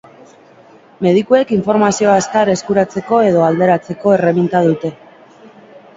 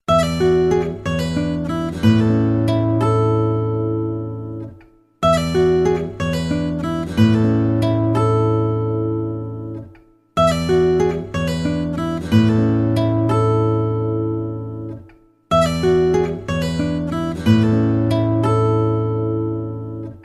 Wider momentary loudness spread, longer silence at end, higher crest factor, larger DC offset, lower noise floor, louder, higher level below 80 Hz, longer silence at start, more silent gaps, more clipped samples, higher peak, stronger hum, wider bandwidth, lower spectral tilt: second, 4 LU vs 11 LU; first, 0.2 s vs 0.05 s; about the same, 14 dB vs 16 dB; neither; about the same, -44 dBFS vs -47 dBFS; first, -13 LUFS vs -18 LUFS; second, -54 dBFS vs -40 dBFS; first, 1 s vs 0.1 s; neither; neither; about the same, 0 dBFS vs -2 dBFS; neither; second, 7.8 kHz vs 12 kHz; second, -6 dB/octave vs -7.5 dB/octave